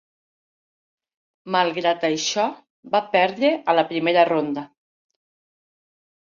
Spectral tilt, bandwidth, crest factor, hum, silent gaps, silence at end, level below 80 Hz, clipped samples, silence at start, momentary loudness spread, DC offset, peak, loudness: -3.5 dB/octave; 7.6 kHz; 20 dB; none; 2.70-2.83 s; 1.65 s; -74 dBFS; under 0.1%; 1.45 s; 6 LU; under 0.1%; -4 dBFS; -21 LUFS